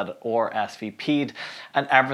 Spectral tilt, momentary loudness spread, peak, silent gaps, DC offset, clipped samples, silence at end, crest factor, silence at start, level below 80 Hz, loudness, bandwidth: -5.5 dB/octave; 11 LU; -2 dBFS; none; under 0.1%; under 0.1%; 0 s; 22 dB; 0 s; -78 dBFS; -25 LUFS; 12 kHz